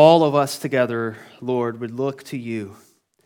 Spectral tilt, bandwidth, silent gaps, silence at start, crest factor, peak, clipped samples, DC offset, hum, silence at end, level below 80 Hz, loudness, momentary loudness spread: -6 dB/octave; 18 kHz; none; 0 s; 20 dB; 0 dBFS; under 0.1%; under 0.1%; none; 0.55 s; -72 dBFS; -22 LUFS; 14 LU